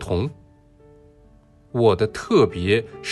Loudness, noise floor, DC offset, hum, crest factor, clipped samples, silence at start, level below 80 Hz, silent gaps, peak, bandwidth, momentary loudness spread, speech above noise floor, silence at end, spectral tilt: -21 LUFS; -52 dBFS; under 0.1%; none; 18 dB; under 0.1%; 0 s; -46 dBFS; none; -6 dBFS; 11.5 kHz; 9 LU; 32 dB; 0 s; -6.5 dB/octave